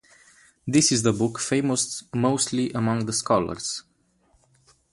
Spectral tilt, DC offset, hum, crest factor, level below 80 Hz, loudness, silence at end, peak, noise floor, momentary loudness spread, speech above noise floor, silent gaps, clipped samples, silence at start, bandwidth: -4 dB/octave; under 0.1%; none; 20 dB; -56 dBFS; -23 LUFS; 1.1 s; -6 dBFS; -64 dBFS; 10 LU; 41 dB; none; under 0.1%; 0.65 s; 11.5 kHz